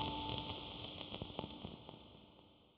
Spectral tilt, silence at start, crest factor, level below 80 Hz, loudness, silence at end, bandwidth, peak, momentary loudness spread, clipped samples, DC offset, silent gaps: -3 dB/octave; 0 s; 24 dB; -62 dBFS; -47 LUFS; 0 s; 6.6 kHz; -24 dBFS; 18 LU; under 0.1%; under 0.1%; none